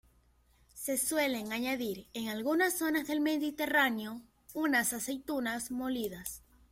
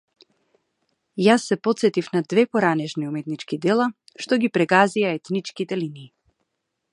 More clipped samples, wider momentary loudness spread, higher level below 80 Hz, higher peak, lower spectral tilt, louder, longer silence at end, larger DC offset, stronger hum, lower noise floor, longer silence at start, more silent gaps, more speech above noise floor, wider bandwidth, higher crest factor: neither; about the same, 12 LU vs 11 LU; first, -66 dBFS vs -72 dBFS; second, -14 dBFS vs -2 dBFS; second, -2.5 dB/octave vs -5.5 dB/octave; second, -33 LUFS vs -21 LUFS; second, 0.3 s vs 0.85 s; neither; neither; second, -67 dBFS vs -78 dBFS; second, 0.75 s vs 1.15 s; neither; second, 34 dB vs 57 dB; first, 16.5 kHz vs 11.5 kHz; about the same, 20 dB vs 22 dB